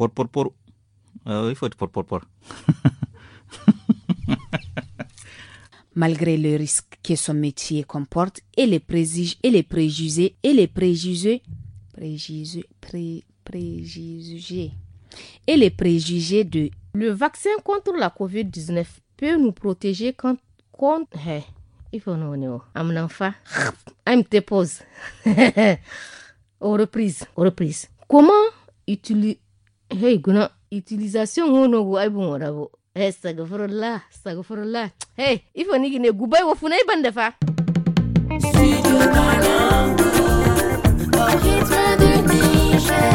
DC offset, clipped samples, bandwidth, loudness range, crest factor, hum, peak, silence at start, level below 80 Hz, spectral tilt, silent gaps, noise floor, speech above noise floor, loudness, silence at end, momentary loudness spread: under 0.1%; under 0.1%; 16.5 kHz; 10 LU; 18 dB; none; -2 dBFS; 0 s; -34 dBFS; -5.5 dB/octave; none; -56 dBFS; 36 dB; -20 LUFS; 0 s; 17 LU